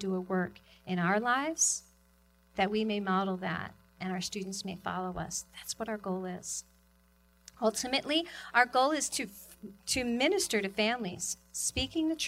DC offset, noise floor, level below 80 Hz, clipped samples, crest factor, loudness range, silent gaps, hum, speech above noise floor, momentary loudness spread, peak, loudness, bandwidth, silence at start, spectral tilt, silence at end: under 0.1%; -65 dBFS; -58 dBFS; under 0.1%; 22 dB; 7 LU; none; none; 33 dB; 11 LU; -10 dBFS; -32 LUFS; 16 kHz; 0 s; -3 dB/octave; 0 s